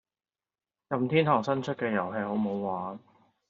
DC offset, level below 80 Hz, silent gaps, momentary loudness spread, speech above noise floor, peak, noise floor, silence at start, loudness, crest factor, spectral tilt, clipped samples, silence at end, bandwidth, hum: under 0.1%; -74 dBFS; none; 11 LU; over 62 dB; -8 dBFS; under -90 dBFS; 0.9 s; -29 LUFS; 22 dB; -5.5 dB/octave; under 0.1%; 0.5 s; 7.4 kHz; none